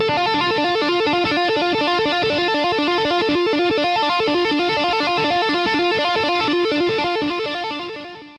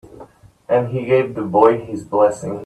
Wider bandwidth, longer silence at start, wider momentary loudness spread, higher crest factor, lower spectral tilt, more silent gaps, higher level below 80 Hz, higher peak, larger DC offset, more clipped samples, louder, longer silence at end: about the same, 11.5 kHz vs 11 kHz; second, 0 s vs 0.15 s; about the same, 4 LU vs 6 LU; second, 10 dB vs 18 dB; second, -4.5 dB/octave vs -7.5 dB/octave; neither; about the same, -54 dBFS vs -54 dBFS; second, -8 dBFS vs 0 dBFS; neither; neither; about the same, -18 LUFS vs -17 LUFS; about the same, 0 s vs 0 s